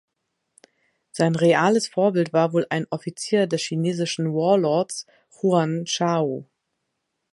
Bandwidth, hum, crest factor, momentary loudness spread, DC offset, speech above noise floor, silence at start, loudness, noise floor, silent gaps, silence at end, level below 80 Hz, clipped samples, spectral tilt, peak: 11.5 kHz; none; 18 dB; 10 LU; under 0.1%; 56 dB; 1.15 s; -22 LUFS; -78 dBFS; none; 0.9 s; -72 dBFS; under 0.1%; -5.5 dB/octave; -4 dBFS